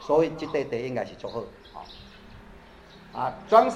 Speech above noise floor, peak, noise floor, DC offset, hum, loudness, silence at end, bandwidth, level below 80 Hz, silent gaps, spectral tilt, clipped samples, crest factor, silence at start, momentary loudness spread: 24 dB; -4 dBFS; -49 dBFS; under 0.1%; none; -27 LUFS; 0 s; 10.5 kHz; -56 dBFS; none; -6 dB/octave; under 0.1%; 22 dB; 0 s; 26 LU